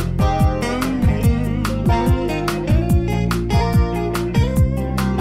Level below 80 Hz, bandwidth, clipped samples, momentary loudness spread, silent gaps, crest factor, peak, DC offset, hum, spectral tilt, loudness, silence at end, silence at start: -22 dBFS; 16 kHz; under 0.1%; 4 LU; none; 14 dB; -4 dBFS; under 0.1%; none; -7 dB/octave; -19 LUFS; 0 s; 0 s